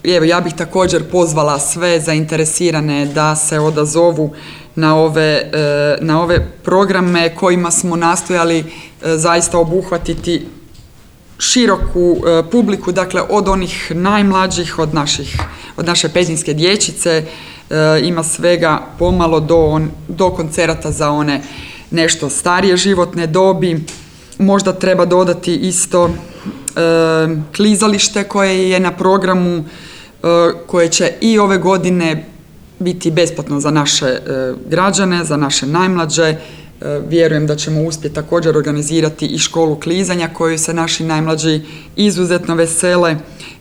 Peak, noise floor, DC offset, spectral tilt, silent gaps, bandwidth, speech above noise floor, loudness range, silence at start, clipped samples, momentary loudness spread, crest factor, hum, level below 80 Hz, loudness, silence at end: 0 dBFS; -41 dBFS; 0.2%; -4.5 dB/octave; none; over 20 kHz; 28 dB; 2 LU; 0.05 s; under 0.1%; 9 LU; 12 dB; none; -34 dBFS; -13 LUFS; 0.05 s